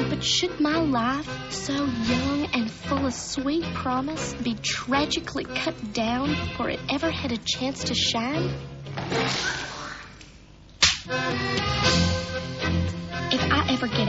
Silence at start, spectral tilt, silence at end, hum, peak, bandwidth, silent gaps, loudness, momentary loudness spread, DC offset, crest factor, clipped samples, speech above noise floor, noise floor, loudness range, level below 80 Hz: 0 s; -3 dB/octave; 0 s; none; -6 dBFS; 8 kHz; none; -25 LUFS; 9 LU; under 0.1%; 20 dB; under 0.1%; 23 dB; -48 dBFS; 2 LU; -44 dBFS